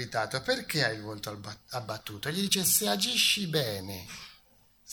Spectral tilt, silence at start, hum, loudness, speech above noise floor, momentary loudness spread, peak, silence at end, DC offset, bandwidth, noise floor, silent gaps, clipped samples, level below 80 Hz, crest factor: -2.5 dB/octave; 0 s; none; -28 LUFS; 32 dB; 17 LU; -10 dBFS; 0 s; under 0.1%; 19.5 kHz; -63 dBFS; none; under 0.1%; -64 dBFS; 20 dB